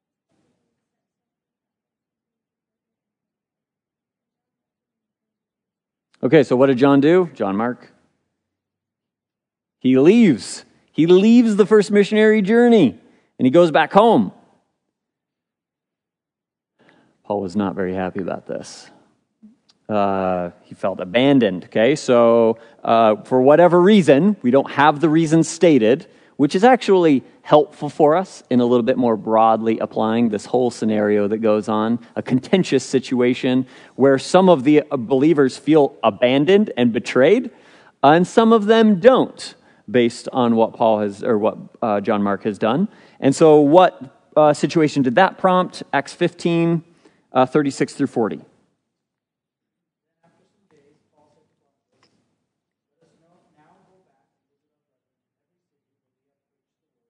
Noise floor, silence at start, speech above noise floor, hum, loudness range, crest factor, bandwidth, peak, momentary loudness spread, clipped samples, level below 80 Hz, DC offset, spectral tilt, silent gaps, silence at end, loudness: -87 dBFS; 6.25 s; 71 dB; none; 10 LU; 18 dB; 10.5 kHz; 0 dBFS; 11 LU; under 0.1%; -68 dBFS; under 0.1%; -6.5 dB/octave; none; 8.7 s; -16 LUFS